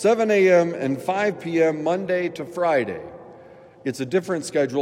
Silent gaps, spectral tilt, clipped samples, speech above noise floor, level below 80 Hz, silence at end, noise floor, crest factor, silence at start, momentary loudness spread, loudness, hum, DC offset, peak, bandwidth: none; -5.5 dB/octave; under 0.1%; 25 dB; -70 dBFS; 0 s; -46 dBFS; 16 dB; 0 s; 13 LU; -22 LUFS; none; under 0.1%; -6 dBFS; 15 kHz